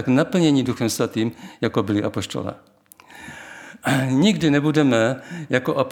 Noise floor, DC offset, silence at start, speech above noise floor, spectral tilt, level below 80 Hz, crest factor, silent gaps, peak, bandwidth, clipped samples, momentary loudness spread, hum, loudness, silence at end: -47 dBFS; under 0.1%; 0 s; 28 dB; -5.5 dB/octave; -60 dBFS; 18 dB; none; -2 dBFS; 18 kHz; under 0.1%; 19 LU; none; -21 LUFS; 0 s